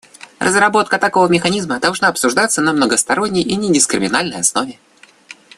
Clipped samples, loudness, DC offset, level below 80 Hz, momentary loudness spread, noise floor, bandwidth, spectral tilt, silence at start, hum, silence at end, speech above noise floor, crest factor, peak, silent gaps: under 0.1%; -14 LUFS; under 0.1%; -54 dBFS; 4 LU; -41 dBFS; 13.5 kHz; -3 dB/octave; 0.4 s; none; 0.25 s; 26 dB; 16 dB; 0 dBFS; none